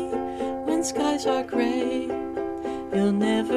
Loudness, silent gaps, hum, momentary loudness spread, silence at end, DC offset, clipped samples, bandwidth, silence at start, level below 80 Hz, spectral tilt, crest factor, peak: -26 LUFS; none; none; 7 LU; 0 s; under 0.1%; under 0.1%; 14 kHz; 0 s; -54 dBFS; -5 dB/octave; 14 dB; -10 dBFS